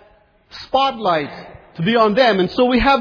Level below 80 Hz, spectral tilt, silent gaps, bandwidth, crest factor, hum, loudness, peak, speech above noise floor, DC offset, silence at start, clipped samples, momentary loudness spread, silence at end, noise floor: -38 dBFS; -6.5 dB/octave; none; 5.4 kHz; 14 dB; none; -16 LUFS; -2 dBFS; 36 dB; under 0.1%; 0.55 s; under 0.1%; 20 LU; 0 s; -52 dBFS